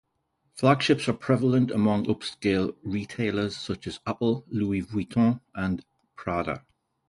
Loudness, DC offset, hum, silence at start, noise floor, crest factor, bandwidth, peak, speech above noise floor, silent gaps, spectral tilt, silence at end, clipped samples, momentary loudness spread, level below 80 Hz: -27 LUFS; under 0.1%; none; 0.55 s; -74 dBFS; 20 dB; 11.5 kHz; -8 dBFS; 49 dB; none; -6.5 dB/octave; 0.5 s; under 0.1%; 11 LU; -52 dBFS